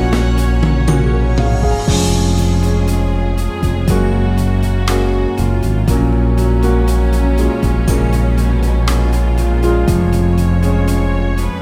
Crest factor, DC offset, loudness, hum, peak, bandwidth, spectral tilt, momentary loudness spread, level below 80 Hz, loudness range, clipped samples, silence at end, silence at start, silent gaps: 12 dB; under 0.1%; -15 LUFS; none; 0 dBFS; 15.5 kHz; -6.5 dB/octave; 3 LU; -16 dBFS; 1 LU; under 0.1%; 0 s; 0 s; none